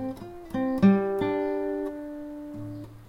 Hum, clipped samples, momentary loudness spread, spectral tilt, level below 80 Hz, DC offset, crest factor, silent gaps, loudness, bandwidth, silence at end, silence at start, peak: none; under 0.1%; 17 LU; -9 dB/octave; -54 dBFS; under 0.1%; 20 dB; none; -26 LUFS; 6 kHz; 0 s; 0 s; -8 dBFS